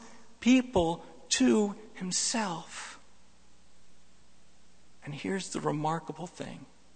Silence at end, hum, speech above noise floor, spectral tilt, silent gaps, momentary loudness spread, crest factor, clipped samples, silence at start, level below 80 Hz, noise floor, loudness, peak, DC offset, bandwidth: 0.3 s; none; 33 dB; -4 dB/octave; none; 18 LU; 18 dB; under 0.1%; 0 s; -58 dBFS; -63 dBFS; -30 LUFS; -14 dBFS; 0.3%; 9.4 kHz